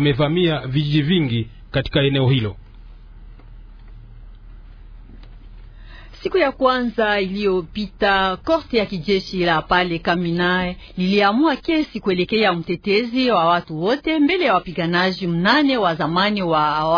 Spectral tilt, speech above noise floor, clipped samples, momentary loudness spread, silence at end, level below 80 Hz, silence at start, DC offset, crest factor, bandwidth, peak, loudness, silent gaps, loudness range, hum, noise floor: -7.5 dB/octave; 22 dB; under 0.1%; 6 LU; 0 s; -42 dBFS; 0 s; under 0.1%; 18 dB; 5.4 kHz; -2 dBFS; -19 LUFS; none; 6 LU; none; -40 dBFS